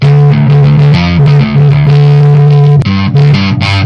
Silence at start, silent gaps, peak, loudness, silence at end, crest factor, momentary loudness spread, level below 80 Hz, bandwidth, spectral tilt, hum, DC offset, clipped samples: 0 s; none; 0 dBFS; -6 LUFS; 0 s; 4 dB; 3 LU; -32 dBFS; 6.2 kHz; -8.5 dB/octave; none; under 0.1%; under 0.1%